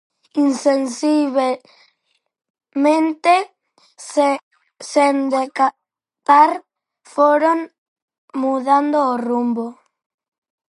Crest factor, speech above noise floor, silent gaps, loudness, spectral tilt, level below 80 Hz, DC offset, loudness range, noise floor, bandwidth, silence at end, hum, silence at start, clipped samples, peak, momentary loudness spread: 18 dB; 53 dB; 2.50-2.54 s, 4.43-4.51 s, 7.78-7.96 s, 8.02-8.08 s, 8.18-8.28 s; -17 LUFS; -3.5 dB/octave; -78 dBFS; under 0.1%; 3 LU; -69 dBFS; 11.5 kHz; 1 s; none; 0.35 s; under 0.1%; -2 dBFS; 14 LU